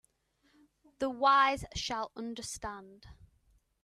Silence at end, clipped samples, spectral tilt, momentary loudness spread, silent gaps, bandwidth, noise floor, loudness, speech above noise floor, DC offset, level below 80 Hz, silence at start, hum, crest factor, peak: 0.7 s; under 0.1%; -3 dB/octave; 16 LU; none; 13.5 kHz; -73 dBFS; -31 LUFS; 41 dB; under 0.1%; -58 dBFS; 1 s; none; 20 dB; -14 dBFS